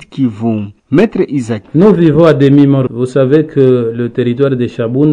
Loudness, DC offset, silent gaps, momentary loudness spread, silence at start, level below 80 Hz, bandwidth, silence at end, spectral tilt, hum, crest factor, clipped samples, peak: -11 LUFS; under 0.1%; none; 9 LU; 0 s; -44 dBFS; 9.8 kHz; 0 s; -9 dB/octave; none; 10 dB; 2%; 0 dBFS